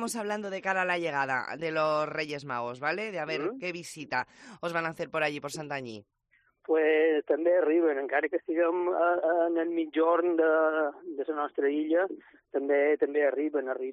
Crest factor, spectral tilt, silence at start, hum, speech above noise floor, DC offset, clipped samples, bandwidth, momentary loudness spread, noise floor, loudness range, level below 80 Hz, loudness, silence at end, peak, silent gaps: 14 dB; -5 dB/octave; 0 s; none; 41 dB; under 0.1%; under 0.1%; 11.5 kHz; 11 LU; -69 dBFS; 7 LU; -78 dBFS; -29 LUFS; 0 s; -14 dBFS; none